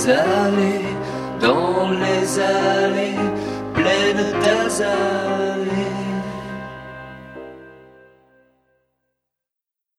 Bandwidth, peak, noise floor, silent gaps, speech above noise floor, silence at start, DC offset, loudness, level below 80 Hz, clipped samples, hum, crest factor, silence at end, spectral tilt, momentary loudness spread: 14 kHz; -2 dBFS; -85 dBFS; none; 67 dB; 0 s; under 0.1%; -19 LUFS; -52 dBFS; under 0.1%; none; 20 dB; 2.2 s; -4.5 dB/octave; 18 LU